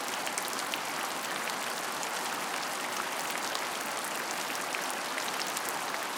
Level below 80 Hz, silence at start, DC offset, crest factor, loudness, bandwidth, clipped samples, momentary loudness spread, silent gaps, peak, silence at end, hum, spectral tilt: -86 dBFS; 0 s; under 0.1%; 26 dB; -33 LUFS; 19 kHz; under 0.1%; 1 LU; none; -10 dBFS; 0 s; none; -0.5 dB/octave